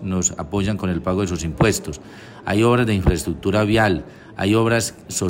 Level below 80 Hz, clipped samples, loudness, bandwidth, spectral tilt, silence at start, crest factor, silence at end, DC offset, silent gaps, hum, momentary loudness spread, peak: -36 dBFS; under 0.1%; -20 LUFS; 16 kHz; -5 dB/octave; 0 s; 16 dB; 0 s; under 0.1%; none; none; 11 LU; -4 dBFS